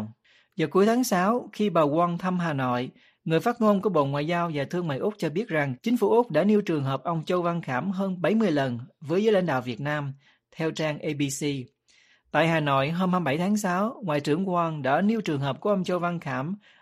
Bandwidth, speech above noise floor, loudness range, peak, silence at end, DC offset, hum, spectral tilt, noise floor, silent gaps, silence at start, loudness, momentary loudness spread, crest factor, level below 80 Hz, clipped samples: 15 kHz; 37 dB; 3 LU; -8 dBFS; 0.25 s; under 0.1%; none; -6 dB/octave; -62 dBFS; none; 0 s; -26 LUFS; 8 LU; 18 dB; -68 dBFS; under 0.1%